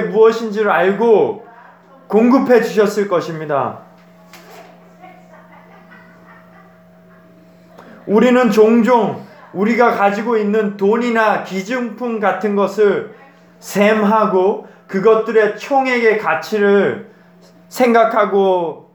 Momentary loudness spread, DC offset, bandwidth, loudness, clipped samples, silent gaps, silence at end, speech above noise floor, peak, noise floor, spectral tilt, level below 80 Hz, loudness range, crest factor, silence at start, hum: 10 LU; under 0.1%; 19.5 kHz; -14 LUFS; under 0.1%; none; 0.15 s; 32 dB; 0 dBFS; -45 dBFS; -6 dB/octave; -66 dBFS; 5 LU; 16 dB; 0 s; none